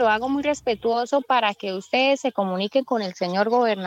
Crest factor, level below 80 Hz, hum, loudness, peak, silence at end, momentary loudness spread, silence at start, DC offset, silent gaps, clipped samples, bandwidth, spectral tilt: 14 dB; -62 dBFS; none; -23 LUFS; -8 dBFS; 0 s; 5 LU; 0 s; under 0.1%; none; under 0.1%; 9.2 kHz; -4.5 dB/octave